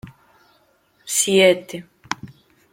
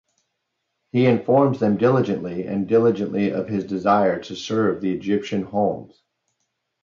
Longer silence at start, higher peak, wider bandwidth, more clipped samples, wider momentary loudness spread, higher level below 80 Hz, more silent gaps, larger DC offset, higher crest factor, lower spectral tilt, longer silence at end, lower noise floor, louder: second, 0.05 s vs 0.95 s; about the same, -2 dBFS vs -4 dBFS; first, 16.5 kHz vs 7.4 kHz; neither; first, 21 LU vs 8 LU; about the same, -62 dBFS vs -60 dBFS; neither; neither; about the same, 20 dB vs 18 dB; second, -2.5 dB/octave vs -7.5 dB/octave; second, 0.45 s vs 0.95 s; second, -60 dBFS vs -77 dBFS; first, -18 LUFS vs -21 LUFS